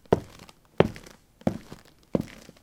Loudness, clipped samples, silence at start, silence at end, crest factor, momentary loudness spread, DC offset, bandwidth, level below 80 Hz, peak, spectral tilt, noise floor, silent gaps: -29 LUFS; under 0.1%; 0.1 s; 0.35 s; 28 dB; 23 LU; under 0.1%; 17.5 kHz; -52 dBFS; -2 dBFS; -7 dB/octave; -51 dBFS; none